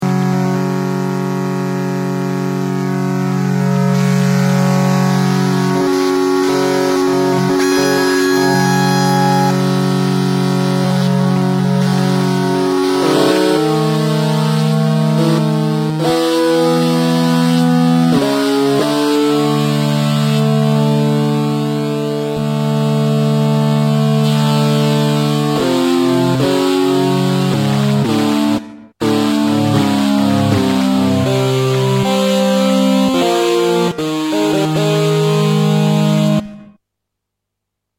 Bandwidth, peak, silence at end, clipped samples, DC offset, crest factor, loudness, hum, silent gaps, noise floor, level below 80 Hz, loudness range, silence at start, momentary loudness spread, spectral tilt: 16.5 kHz; 0 dBFS; 1.35 s; under 0.1%; under 0.1%; 12 dB; -14 LUFS; none; none; -77 dBFS; -54 dBFS; 2 LU; 0 s; 4 LU; -6 dB/octave